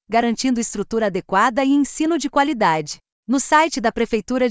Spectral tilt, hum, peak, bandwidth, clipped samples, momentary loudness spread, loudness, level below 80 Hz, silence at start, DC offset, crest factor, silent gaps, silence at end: -4 dB/octave; none; -4 dBFS; 8 kHz; under 0.1%; 7 LU; -19 LUFS; -50 dBFS; 0.1 s; under 0.1%; 16 dB; 3.12-3.23 s; 0 s